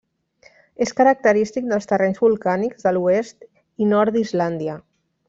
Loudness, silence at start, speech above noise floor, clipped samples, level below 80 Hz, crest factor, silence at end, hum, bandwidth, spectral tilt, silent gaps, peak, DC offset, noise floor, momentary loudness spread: -19 LUFS; 0.8 s; 36 dB; under 0.1%; -62 dBFS; 16 dB; 0.5 s; none; 7.8 kHz; -6.5 dB/octave; none; -4 dBFS; under 0.1%; -55 dBFS; 9 LU